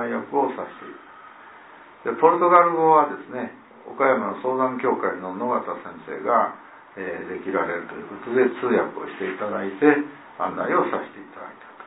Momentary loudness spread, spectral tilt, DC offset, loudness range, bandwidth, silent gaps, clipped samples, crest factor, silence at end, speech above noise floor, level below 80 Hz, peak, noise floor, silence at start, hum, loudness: 19 LU; -10 dB/octave; under 0.1%; 6 LU; 4 kHz; none; under 0.1%; 22 dB; 0 s; 23 dB; -70 dBFS; -2 dBFS; -46 dBFS; 0 s; none; -22 LUFS